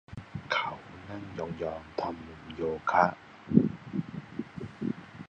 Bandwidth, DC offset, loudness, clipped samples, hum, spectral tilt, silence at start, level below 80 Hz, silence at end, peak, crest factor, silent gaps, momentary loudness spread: 8 kHz; under 0.1%; -32 LUFS; under 0.1%; none; -7.5 dB/octave; 0.1 s; -58 dBFS; 0 s; -6 dBFS; 28 dB; none; 17 LU